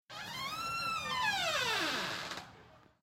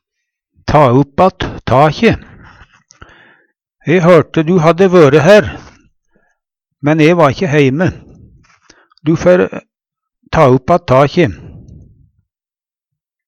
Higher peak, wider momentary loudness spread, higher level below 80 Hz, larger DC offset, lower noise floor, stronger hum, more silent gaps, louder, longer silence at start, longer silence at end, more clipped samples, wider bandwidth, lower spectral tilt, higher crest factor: second, -20 dBFS vs 0 dBFS; about the same, 12 LU vs 14 LU; second, -68 dBFS vs -38 dBFS; neither; second, -60 dBFS vs under -90 dBFS; neither; neither; second, -35 LUFS vs -10 LUFS; second, 0.1 s vs 0.65 s; second, 0.25 s vs 1.7 s; second, under 0.1% vs 0.1%; first, 16 kHz vs 10.5 kHz; second, -1.5 dB/octave vs -7 dB/octave; about the same, 16 dB vs 12 dB